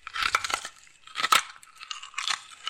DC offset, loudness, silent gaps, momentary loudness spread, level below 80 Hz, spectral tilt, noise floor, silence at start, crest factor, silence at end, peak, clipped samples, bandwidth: under 0.1%; -27 LUFS; none; 19 LU; -62 dBFS; 1.5 dB/octave; -49 dBFS; 0.05 s; 22 dB; 0 s; -8 dBFS; under 0.1%; 16.5 kHz